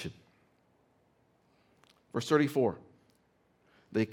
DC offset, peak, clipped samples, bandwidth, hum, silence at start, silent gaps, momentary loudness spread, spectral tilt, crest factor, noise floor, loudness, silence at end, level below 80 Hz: under 0.1%; -12 dBFS; under 0.1%; 17.5 kHz; none; 0 s; none; 16 LU; -6 dB/octave; 24 dB; -70 dBFS; -31 LUFS; 0 s; -74 dBFS